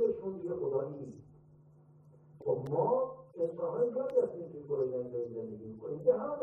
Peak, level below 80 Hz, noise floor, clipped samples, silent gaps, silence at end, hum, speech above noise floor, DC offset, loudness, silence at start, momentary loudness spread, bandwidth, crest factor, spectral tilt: -16 dBFS; -74 dBFS; -60 dBFS; under 0.1%; none; 0 s; none; 27 dB; under 0.1%; -35 LUFS; 0 s; 13 LU; 2.7 kHz; 20 dB; -10.5 dB/octave